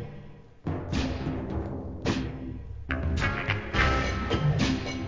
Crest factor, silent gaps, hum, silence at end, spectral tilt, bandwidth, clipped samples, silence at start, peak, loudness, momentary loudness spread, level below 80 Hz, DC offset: 18 dB; none; none; 0 s; -6 dB/octave; 7.6 kHz; under 0.1%; 0 s; -10 dBFS; -29 LUFS; 14 LU; -36 dBFS; 0.2%